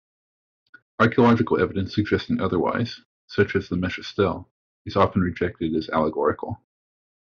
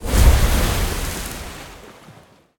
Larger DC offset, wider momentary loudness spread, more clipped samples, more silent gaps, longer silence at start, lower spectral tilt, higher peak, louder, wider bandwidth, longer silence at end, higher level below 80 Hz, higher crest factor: neither; second, 14 LU vs 21 LU; neither; first, 3.05-3.28 s, 4.51-4.85 s vs none; first, 1 s vs 0 s; about the same, -5.5 dB/octave vs -4.5 dB/octave; second, -4 dBFS vs 0 dBFS; second, -23 LUFS vs -20 LUFS; second, 7 kHz vs 18.5 kHz; first, 0.75 s vs 0.45 s; second, -54 dBFS vs -20 dBFS; about the same, 18 dB vs 18 dB